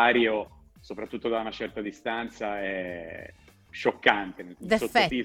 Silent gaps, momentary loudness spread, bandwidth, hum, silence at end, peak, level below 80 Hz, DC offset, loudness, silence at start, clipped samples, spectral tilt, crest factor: none; 18 LU; 17 kHz; none; 0 s; -4 dBFS; -56 dBFS; under 0.1%; -28 LUFS; 0 s; under 0.1%; -4.5 dB/octave; 24 dB